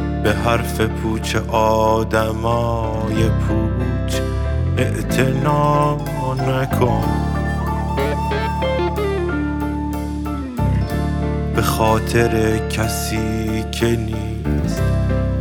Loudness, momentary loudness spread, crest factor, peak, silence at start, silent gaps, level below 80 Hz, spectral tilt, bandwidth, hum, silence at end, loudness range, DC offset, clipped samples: -19 LUFS; 6 LU; 16 dB; -2 dBFS; 0 s; none; -26 dBFS; -6.5 dB/octave; 19.5 kHz; none; 0 s; 3 LU; under 0.1%; under 0.1%